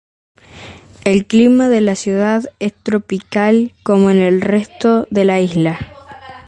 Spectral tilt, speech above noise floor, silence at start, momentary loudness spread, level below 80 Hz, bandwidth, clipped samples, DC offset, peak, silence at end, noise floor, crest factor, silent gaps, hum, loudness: -6.5 dB/octave; 23 dB; 0.55 s; 10 LU; -48 dBFS; 9.4 kHz; under 0.1%; under 0.1%; 0 dBFS; 0.1 s; -37 dBFS; 14 dB; none; none; -14 LUFS